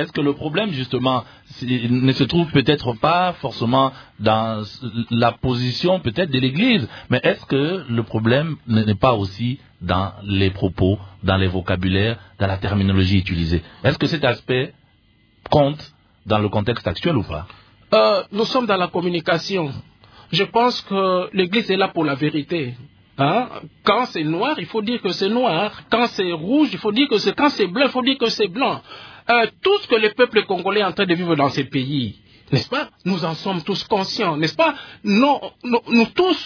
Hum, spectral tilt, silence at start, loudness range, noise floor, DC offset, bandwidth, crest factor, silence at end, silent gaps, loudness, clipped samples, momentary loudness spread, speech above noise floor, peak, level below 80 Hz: none; -6.5 dB/octave; 0 s; 3 LU; -57 dBFS; under 0.1%; 5.4 kHz; 18 dB; 0 s; none; -20 LUFS; under 0.1%; 7 LU; 37 dB; -2 dBFS; -46 dBFS